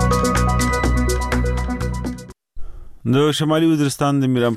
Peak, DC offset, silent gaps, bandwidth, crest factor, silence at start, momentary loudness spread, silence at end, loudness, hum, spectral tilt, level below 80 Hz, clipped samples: -8 dBFS; under 0.1%; none; 15 kHz; 10 dB; 0 s; 9 LU; 0 s; -19 LUFS; none; -5.5 dB/octave; -26 dBFS; under 0.1%